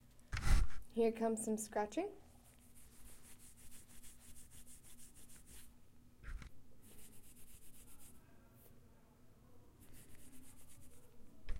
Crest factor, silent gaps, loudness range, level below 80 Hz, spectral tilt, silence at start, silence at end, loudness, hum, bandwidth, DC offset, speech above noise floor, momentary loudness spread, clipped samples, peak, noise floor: 24 dB; none; 21 LU; -48 dBFS; -5 dB/octave; 0.15 s; 0 s; -41 LUFS; none; 16.5 kHz; under 0.1%; 25 dB; 26 LU; under 0.1%; -18 dBFS; -64 dBFS